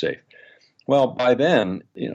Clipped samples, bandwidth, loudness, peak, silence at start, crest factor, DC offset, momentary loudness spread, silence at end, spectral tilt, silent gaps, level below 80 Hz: under 0.1%; 8 kHz; -20 LUFS; -4 dBFS; 0 s; 18 dB; under 0.1%; 17 LU; 0 s; -6.5 dB/octave; none; -64 dBFS